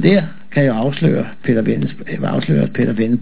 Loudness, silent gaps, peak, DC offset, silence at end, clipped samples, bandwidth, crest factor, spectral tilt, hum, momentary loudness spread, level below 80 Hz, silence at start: -17 LUFS; none; 0 dBFS; 4%; 0 s; under 0.1%; 4 kHz; 16 dB; -11.5 dB/octave; none; 6 LU; -56 dBFS; 0 s